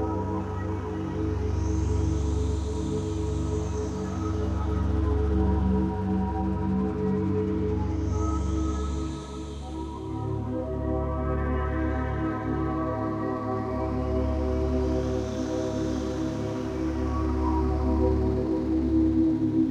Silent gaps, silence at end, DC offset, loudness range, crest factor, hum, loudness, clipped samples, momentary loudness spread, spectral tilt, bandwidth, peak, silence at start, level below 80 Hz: none; 0 s; under 0.1%; 4 LU; 14 dB; none; -28 LUFS; under 0.1%; 6 LU; -8 dB/octave; 8.8 kHz; -12 dBFS; 0 s; -32 dBFS